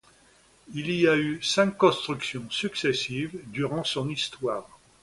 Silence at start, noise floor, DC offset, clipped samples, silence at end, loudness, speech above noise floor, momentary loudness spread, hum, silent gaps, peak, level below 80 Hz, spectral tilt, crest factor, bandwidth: 0.7 s; -59 dBFS; under 0.1%; under 0.1%; 0.35 s; -26 LUFS; 32 dB; 11 LU; none; none; -6 dBFS; -62 dBFS; -4.5 dB/octave; 20 dB; 11.5 kHz